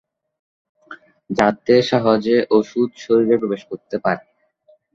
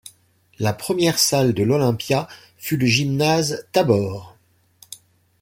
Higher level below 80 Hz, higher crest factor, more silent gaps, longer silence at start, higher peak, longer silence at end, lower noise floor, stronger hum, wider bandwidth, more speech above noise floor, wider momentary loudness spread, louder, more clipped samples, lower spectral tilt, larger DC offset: about the same, -58 dBFS vs -56 dBFS; about the same, 18 dB vs 18 dB; neither; first, 0.9 s vs 0.6 s; about the same, -2 dBFS vs -2 dBFS; first, 0.75 s vs 0.45 s; about the same, -56 dBFS vs -59 dBFS; neither; second, 7.6 kHz vs 17 kHz; about the same, 39 dB vs 40 dB; second, 11 LU vs 20 LU; about the same, -18 LUFS vs -19 LUFS; neither; first, -6.5 dB/octave vs -4.5 dB/octave; neither